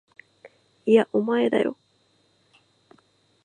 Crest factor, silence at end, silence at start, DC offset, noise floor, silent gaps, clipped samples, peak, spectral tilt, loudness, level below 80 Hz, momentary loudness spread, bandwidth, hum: 20 dB; 1.7 s; 0.45 s; under 0.1%; -65 dBFS; none; under 0.1%; -6 dBFS; -6.5 dB/octave; -22 LUFS; -78 dBFS; 9 LU; 9.4 kHz; none